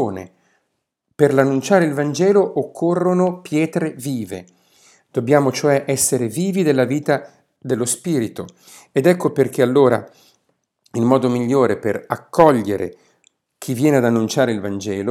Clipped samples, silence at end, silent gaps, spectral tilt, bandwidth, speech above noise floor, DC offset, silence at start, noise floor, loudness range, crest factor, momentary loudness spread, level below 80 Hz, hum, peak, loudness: under 0.1%; 0 s; none; -5.5 dB/octave; 16.5 kHz; 56 dB; under 0.1%; 0 s; -73 dBFS; 2 LU; 18 dB; 12 LU; -62 dBFS; none; 0 dBFS; -18 LUFS